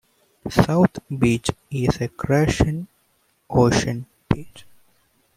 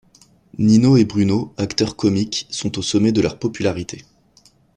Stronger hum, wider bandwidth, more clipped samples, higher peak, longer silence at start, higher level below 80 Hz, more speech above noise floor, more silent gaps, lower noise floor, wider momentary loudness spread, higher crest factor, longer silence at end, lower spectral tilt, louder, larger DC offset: neither; first, 15.5 kHz vs 10 kHz; neither; about the same, 0 dBFS vs -2 dBFS; second, 0.45 s vs 0.6 s; first, -40 dBFS vs -50 dBFS; first, 45 dB vs 37 dB; neither; first, -65 dBFS vs -54 dBFS; about the same, 11 LU vs 12 LU; first, 22 dB vs 16 dB; about the same, 0.75 s vs 0.75 s; about the same, -6 dB/octave vs -6 dB/octave; second, -21 LUFS vs -18 LUFS; neither